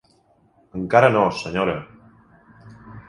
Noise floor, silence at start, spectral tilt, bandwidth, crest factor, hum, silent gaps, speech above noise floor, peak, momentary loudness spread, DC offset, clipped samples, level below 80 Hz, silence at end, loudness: -59 dBFS; 0.75 s; -6.5 dB/octave; 11.5 kHz; 22 dB; none; none; 41 dB; 0 dBFS; 19 LU; under 0.1%; under 0.1%; -52 dBFS; 0.1 s; -20 LUFS